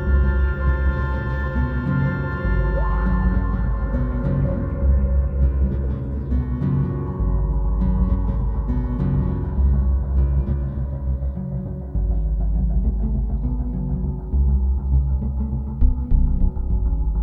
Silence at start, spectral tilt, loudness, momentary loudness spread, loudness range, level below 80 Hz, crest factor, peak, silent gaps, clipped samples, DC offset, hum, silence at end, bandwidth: 0 s; -11.5 dB/octave; -23 LUFS; 5 LU; 2 LU; -20 dBFS; 14 dB; -6 dBFS; none; under 0.1%; under 0.1%; none; 0 s; 3.6 kHz